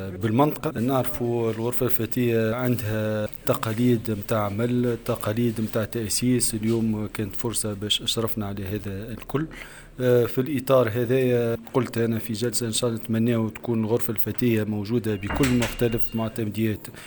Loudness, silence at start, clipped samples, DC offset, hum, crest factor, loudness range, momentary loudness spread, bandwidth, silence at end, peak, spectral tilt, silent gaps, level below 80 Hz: -24 LUFS; 0 s; under 0.1%; under 0.1%; none; 18 dB; 2 LU; 7 LU; over 20 kHz; 0 s; -6 dBFS; -5.5 dB/octave; none; -48 dBFS